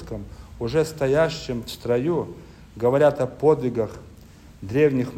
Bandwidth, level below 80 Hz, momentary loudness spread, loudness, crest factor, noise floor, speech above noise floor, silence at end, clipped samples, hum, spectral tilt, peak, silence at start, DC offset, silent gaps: 15.5 kHz; -46 dBFS; 17 LU; -23 LUFS; 18 dB; -46 dBFS; 24 dB; 0 s; under 0.1%; none; -6.5 dB/octave; -6 dBFS; 0 s; under 0.1%; none